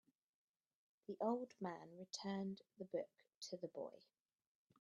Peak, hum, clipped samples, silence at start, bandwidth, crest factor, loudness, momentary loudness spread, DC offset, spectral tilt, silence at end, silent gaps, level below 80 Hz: -28 dBFS; none; under 0.1%; 1.1 s; 8.4 kHz; 22 dB; -49 LUFS; 13 LU; under 0.1%; -5.5 dB/octave; 0.8 s; 3.36-3.41 s; under -90 dBFS